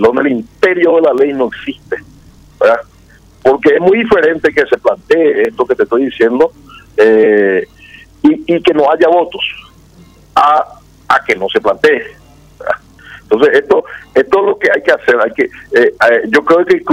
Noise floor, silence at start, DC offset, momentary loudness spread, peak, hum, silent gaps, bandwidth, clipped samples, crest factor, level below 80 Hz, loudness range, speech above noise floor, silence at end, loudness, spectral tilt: -42 dBFS; 0 s; under 0.1%; 10 LU; 0 dBFS; none; none; 10.5 kHz; under 0.1%; 12 dB; -46 dBFS; 3 LU; 32 dB; 0 s; -11 LUFS; -5.5 dB/octave